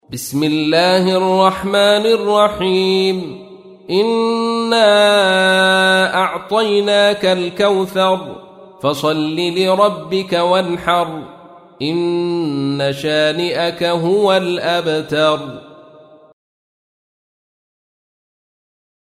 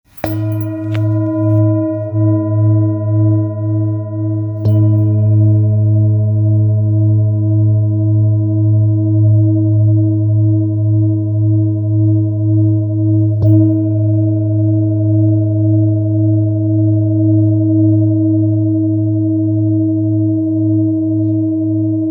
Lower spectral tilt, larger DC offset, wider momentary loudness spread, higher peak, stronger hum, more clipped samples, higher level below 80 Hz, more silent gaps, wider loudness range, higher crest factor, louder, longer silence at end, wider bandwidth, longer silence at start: second, -4.5 dB/octave vs -12.5 dB/octave; neither; first, 9 LU vs 4 LU; about the same, 0 dBFS vs 0 dBFS; neither; neither; about the same, -54 dBFS vs -52 dBFS; neither; first, 5 LU vs 2 LU; about the same, 14 dB vs 12 dB; about the same, -15 LUFS vs -13 LUFS; first, 3.25 s vs 0 s; second, 15.5 kHz vs over 20 kHz; about the same, 0.1 s vs 0.15 s